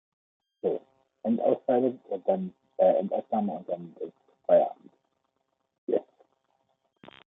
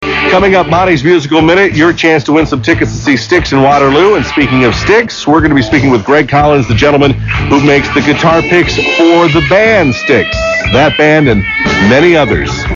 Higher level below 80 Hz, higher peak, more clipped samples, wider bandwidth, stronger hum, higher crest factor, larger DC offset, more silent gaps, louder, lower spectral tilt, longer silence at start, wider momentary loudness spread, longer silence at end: second, -82 dBFS vs -26 dBFS; second, -10 dBFS vs 0 dBFS; neither; second, 3.9 kHz vs 7.6 kHz; neither; first, 20 dB vs 8 dB; neither; first, 5.78-5.87 s vs none; second, -28 LUFS vs -8 LUFS; first, -10.5 dB/octave vs -6 dB/octave; first, 0.65 s vs 0 s; first, 15 LU vs 4 LU; first, 1.25 s vs 0 s